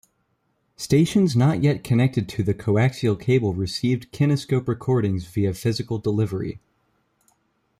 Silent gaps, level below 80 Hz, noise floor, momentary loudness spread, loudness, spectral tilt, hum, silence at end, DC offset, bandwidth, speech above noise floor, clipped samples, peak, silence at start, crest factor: none; -52 dBFS; -70 dBFS; 7 LU; -22 LUFS; -7 dB/octave; none; 1.25 s; under 0.1%; 14.5 kHz; 49 dB; under 0.1%; -8 dBFS; 0.8 s; 14 dB